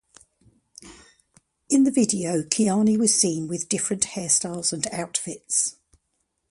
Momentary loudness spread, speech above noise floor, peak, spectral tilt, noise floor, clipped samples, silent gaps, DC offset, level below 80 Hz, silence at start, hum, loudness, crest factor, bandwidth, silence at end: 9 LU; 52 dB; -2 dBFS; -3.5 dB/octave; -75 dBFS; under 0.1%; none; under 0.1%; -62 dBFS; 0.8 s; none; -22 LUFS; 24 dB; 11.5 kHz; 0.8 s